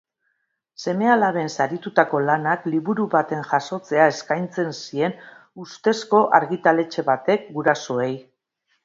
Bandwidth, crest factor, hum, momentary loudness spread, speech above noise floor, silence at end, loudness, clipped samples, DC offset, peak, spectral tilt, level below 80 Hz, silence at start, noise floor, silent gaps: 7.8 kHz; 22 dB; none; 9 LU; 52 dB; 0.65 s; -21 LUFS; under 0.1%; under 0.1%; 0 dBFS; -5.5 dB/octave; -70 dBFS; 0.8 s; -73 dBFS; none